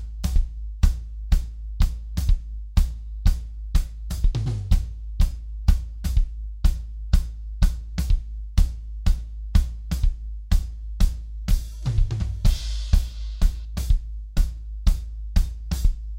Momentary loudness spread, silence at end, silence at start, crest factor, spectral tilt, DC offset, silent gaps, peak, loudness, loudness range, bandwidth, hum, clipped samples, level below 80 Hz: 6 LU; 0 s; 0 s; 18 dB; -6 dB/octave; under 0.1%; none; -4 dBFS; -27 LUFS; 1 LU; 16 kHz; none; under 0.1%; -22 dBFS